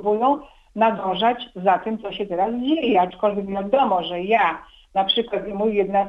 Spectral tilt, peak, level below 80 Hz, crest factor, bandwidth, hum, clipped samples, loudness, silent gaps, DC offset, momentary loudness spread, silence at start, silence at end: -7 dB/octave; -4 dBFS; -54 dBFS; 16 dB; 7.4 kHz; none; under 0.1%; -21 LUFS; none; under 0.1%; 8 LU; 0 s; 0 s